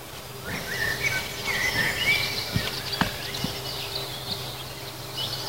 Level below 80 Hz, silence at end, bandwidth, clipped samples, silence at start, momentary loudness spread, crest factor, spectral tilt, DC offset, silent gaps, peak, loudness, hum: -48 dBFS; 0 s; 16 kHz; under 0.1%; 0 s; 11 LU; 24 dB; -2.5 dB/octave; 0.3%; none; -6 dBFS; -27 LUFS; none